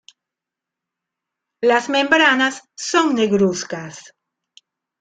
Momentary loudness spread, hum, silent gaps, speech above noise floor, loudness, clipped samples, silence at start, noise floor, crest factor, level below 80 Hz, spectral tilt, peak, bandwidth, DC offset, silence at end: 15 LU; none; none; 68 dB; -17 LUFS; under 0.1%; 1.6 s; -85 dBFS; 20 dB; -64 dBFS; -3.5 dB/octave; 0 dBFS; 9.6 kHz; under 0.1%; 1 s